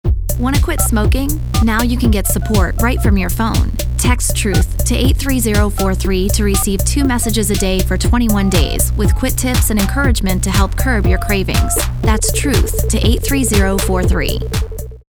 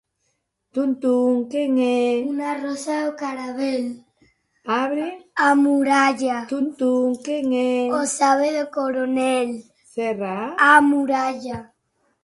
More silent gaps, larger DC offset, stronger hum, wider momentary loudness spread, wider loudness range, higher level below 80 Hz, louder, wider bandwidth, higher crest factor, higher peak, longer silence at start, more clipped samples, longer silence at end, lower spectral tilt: neither; neither; neither; second, 3 LU vs 11 LU; second, 1 LU vs 5 LU; first, -16 dBFS vs -64 dBFS; first, -15 LUFS vs -20 LUFS; first, over 20 kHz vs 11.5 kHz; second, 14 dB vs 20 dB; about the same, 0 dBFS vs -2 dBFS; second, 0.05 s vs 0.75 s; neither; second, 0.15 s vs 0.6 s; about the same, -4.5 dB/octave vs -3.5 dB/octave